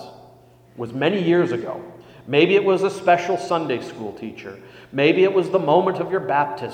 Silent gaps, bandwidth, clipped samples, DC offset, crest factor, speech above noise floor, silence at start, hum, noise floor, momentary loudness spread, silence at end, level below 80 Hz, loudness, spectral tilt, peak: none; 9.6 kHz; under 0.1%; under 0.1%; 18 dB; 30 dB; 0 s; none; -50 dBFS; 17 LU; 0 s; -64 dBFS; -19 LUFS; -6.5 dB/octave; -2 dBFS